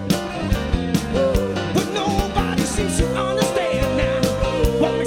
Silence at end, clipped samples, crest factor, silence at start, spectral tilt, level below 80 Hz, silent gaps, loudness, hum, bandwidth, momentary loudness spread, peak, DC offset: 0 s; under 0.1%; 16 dB; 0 s; -5 dB/octave; -28 dBFS; none; -21 LUFS; none; 17.5 kHz; 3 LU; -4 dBFS; under 0.1%